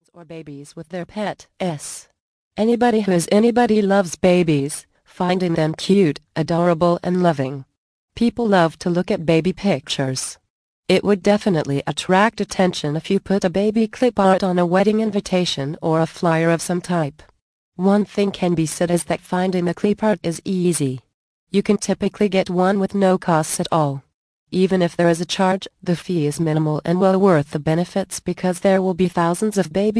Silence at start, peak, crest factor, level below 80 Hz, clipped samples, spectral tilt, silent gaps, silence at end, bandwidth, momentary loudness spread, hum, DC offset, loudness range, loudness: 0.15 s; -2 dBFS; 16 dB; -52 dBFS; under 0.1%; -6 dB/octave; 2.20-2.51 s, 7.77-8.08 s, 10.50-10.83 s, 17.41-17.72 s, 21.14-21.47 s, 24.14-24.47 s; 0 s; 11 kHz; 10 LU; none; under 0.1%; 3 LU; -19 LUFS